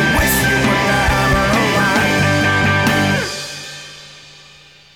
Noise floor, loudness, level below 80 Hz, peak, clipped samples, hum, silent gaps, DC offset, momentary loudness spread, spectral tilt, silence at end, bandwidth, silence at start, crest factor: -44 dBFS; -14 LUFS; -30 dBFS; -6 dBFS; under 0.1%; none; none; under 0.1%; 15 LU; -4 dB/octave; 0.75 s; 20 kHz; 0 s; 10 dB